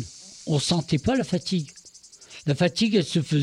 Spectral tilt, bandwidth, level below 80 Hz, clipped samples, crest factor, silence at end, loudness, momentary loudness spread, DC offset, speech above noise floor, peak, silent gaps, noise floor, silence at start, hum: -5.5 dB/octave; 12 kHz; -52 dBFS; under 0.1%; 16 dB; 0 s; -24 LUFS; 17 LU; under 0.1%; 26 dB; -8 dBFS; none; -49 dBFS; 0 s; none